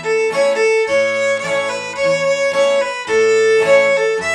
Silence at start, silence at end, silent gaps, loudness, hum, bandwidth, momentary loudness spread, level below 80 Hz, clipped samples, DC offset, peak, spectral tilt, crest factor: 0 s; 0 s; none; -15 LUFS; none; 11.5 kHz; 6 LU; -60 dBFS; under 0.1%; under 0.1%; -2 dBFS; -2.5 dB/octave; 14 dB